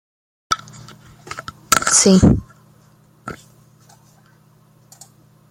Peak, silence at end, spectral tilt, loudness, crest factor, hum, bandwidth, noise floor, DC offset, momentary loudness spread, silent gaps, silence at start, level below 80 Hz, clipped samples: 0 dBFS; 2.15 s; -4 dB/octave; -15 LUFS; 20 dB; none; 16.5 kHz; -52 dBFS; under 0.1%; 25 LU; none; 0.5 s; -38 dBFS; under 0.1%